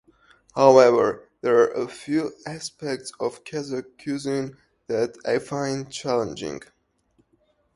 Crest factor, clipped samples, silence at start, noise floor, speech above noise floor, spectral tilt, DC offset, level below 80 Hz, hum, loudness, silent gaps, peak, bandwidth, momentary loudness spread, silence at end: 24 dB; under 0.1%; 0.55 s; -66 dBFS; 43 dB; -5 dB/octave; under 0.1%; -64 dBFS; none; -23 LUFS; none; 0 dBFS; 11.5 kHz; 17 LU; 1.15 s